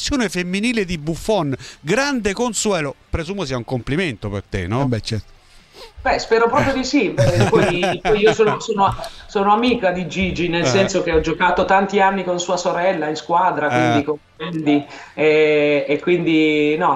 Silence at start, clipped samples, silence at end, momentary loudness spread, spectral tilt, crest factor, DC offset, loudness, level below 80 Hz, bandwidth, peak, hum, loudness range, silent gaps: 0 s; under 0.1%; 0 s; 10 LU; -5 dB/octave; 16 dB; under 0.1%; -18 LUFS; -38 dBFS; 13.5 kHz; -2 dBFS; none; 5 LU; none